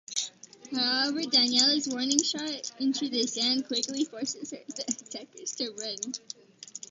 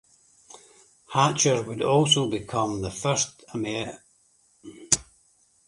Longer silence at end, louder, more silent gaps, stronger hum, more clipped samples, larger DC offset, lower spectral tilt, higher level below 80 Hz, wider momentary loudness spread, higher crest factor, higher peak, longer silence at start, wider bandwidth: second, 0.05 s vs 0.65 s; second, -28 LUFS vs -24 LUFS; neither; neither; neither; neither; second, -0.5 dB/octave vs -3.5 dB/octave; second, -78 dBFS vs -56 dBFS; first, 16 LU vs 10 LU; about the same, 26 dB vs 24 dB; about the same, -4 dBFS vs -4 dBFS; second, 0.1 s vs 0.55 s; second, 8.8 kHz vs 11.5 kHz